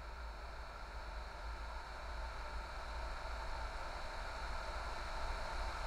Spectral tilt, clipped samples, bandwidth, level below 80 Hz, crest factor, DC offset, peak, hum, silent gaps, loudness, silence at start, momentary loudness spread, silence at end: -4 dB/octave; under 0.1%; 15.5 kHz; -46 dBFS; 14 dB; under 0.1%; -30 dBFS; none; none; -47 LUFS; 0 s; 6 LU; 0 s